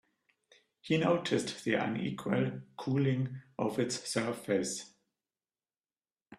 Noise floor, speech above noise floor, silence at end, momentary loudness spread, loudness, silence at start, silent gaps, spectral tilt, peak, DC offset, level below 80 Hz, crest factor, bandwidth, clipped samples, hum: under -90 dBFS; over 57 dB; 0.05 s; 9 LU; -33 LUFS; 0.85 s; none; -5 dB/octave; -16 dBFS; under 0.1%; -72 dBFS; 20 dB; 13.5 kHz; under 0.1%; none